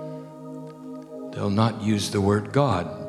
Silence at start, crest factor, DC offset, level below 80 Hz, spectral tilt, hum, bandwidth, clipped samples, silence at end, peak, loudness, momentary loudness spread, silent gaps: 0 s; 18 dB; under 0.1%; -60 dBFS; -6 dB/octave; none; 13.5 kHz; under 0.1%; 0 s; -6 dBFS; -23 LUFS; 16 LU; none